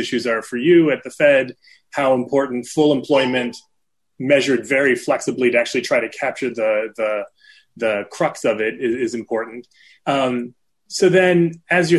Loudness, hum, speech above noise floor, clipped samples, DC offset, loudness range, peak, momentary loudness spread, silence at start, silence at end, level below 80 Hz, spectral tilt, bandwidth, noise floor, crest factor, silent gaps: -19 LUFS; none; 58 dB; under 0.1%; under 0.1%; 5 LU; -4 dBFS; 12 LU; 0 s; 0 s; -62 dBFS; -5 dB/octave; 12 kHz; -76 dBFS; 16 dB; none